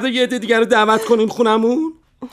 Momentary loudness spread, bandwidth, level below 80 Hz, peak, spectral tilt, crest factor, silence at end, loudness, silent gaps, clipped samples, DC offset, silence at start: 6 LU; 14.5 kHz; -58 dBFS; -2 dBFS; -4 dB/octave; 14 dB; 0.05 s; -15 LUFS; none; under 0.1%; under 0.1%; 0 s